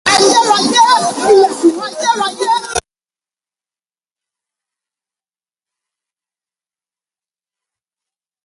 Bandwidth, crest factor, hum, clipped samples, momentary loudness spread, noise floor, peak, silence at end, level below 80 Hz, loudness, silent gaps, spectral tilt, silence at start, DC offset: 11.5 kHz; 16 dB; none; under 0.1%; 8 LU; under -90 dBFS; 0 dBFS; 5.65 s; -52 dBFS; -11 LUFS; none; -2 dB/octave; 0.05 s; under 0.1%